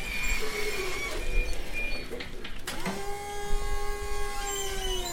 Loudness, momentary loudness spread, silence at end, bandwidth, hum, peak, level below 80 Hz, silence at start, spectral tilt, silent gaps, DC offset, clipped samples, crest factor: -33 LUFS; 7 LU; 0 s; 16.5 kHz; none; -14 dBFS; -34 dBFS; 0 s; -2.5 dB/octave; none; under 0.1%; under 0.1%; 14 dB